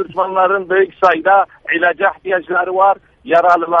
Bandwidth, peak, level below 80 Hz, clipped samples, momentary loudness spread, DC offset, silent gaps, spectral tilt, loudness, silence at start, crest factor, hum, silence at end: 7.4 kHz; 0 dBFS; -56 dBFS; under 0.1%; 6 LU; under 0.1%; none; -6 dB/octave; -14 LUFS; 0 s; 14 dB; none; 0 s